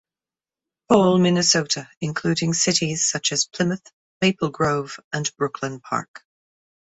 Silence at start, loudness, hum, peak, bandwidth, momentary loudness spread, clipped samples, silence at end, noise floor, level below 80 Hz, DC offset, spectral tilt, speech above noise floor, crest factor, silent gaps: 0.9 s; -21 LUFS; none; -4 dBFS; 8.4 kHz; 11 LU; under 0.1%; 0.75 s; under -90 dBFS; -58 dBFS; under 0.1%; -3.5 dB/octave; over 69 dB; 20 dB; 1.97-2.01 s, 3.93-4.20 s, 5.04-5.11 s, 6.08-6.14 s